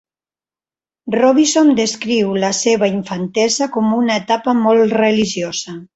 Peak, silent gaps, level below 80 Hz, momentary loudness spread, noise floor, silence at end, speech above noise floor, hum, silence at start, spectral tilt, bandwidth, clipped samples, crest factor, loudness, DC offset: -2 dBFS; none; -58 dBFS; 10 LU; under -90 dBFS; 0.1 s; over 75 dB; none; 1.05 s; -4 dB/octave; 8.2 kHz; under 0.1%; 14 dB; -15 LUFS; under 0.1%